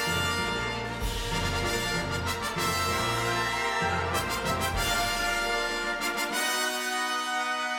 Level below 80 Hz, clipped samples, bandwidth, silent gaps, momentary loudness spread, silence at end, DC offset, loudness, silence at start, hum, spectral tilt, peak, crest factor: -42 dBFS; under 0.1%; 19.5 kHz; none; 4 LU; 0 s; under 0.1%; -28 LUFS; 0 s; none; -3 dB/octave; -14 dBFS; 14 dB